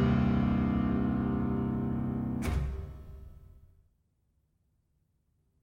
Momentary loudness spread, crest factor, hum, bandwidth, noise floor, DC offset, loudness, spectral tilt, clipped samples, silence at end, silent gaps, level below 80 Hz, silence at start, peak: 18 LU; 16 dB; none; 15 kHz; -74 dBFS; under 0.1%; -31 LUFS; -8.5 dB/octave; under 0.1%; 2.2 s; none; -42 dBFS; 0 s; -16 dBFS